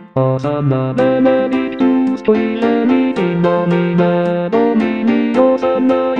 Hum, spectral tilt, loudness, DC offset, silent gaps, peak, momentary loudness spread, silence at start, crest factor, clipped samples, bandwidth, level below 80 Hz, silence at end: none; -9 dB/octave; -14 LUFS; 0.2%; none; 0 dBFS; 3 LU; 0 s; 12 dB; under 0.1%; 7 kHz; -52 dBFS; 0 s